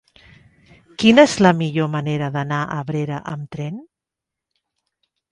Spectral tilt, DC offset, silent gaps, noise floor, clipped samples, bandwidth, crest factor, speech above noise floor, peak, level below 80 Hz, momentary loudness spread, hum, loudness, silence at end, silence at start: -6 dB/octave; under 0.1%; none; -85 dBFS; under 0.1%; 11 kHz; 20 dB; 67 dB; 0 dBFS; -56 dBFS; 18 LU; none; -18 LUFS; 1.5 s; 1 s